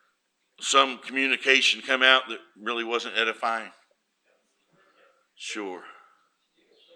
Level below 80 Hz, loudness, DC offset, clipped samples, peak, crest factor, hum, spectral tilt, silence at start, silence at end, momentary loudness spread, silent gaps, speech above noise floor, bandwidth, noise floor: -90 dBFS; -23 LUFS; under 0.1%; under 0.1%; -2 dBFS; 24 dB; none; 0 dB/octave; 0.6 s; 1.05 s; 19 LU; none; 49 dB; 14 kHz; -74 dBFS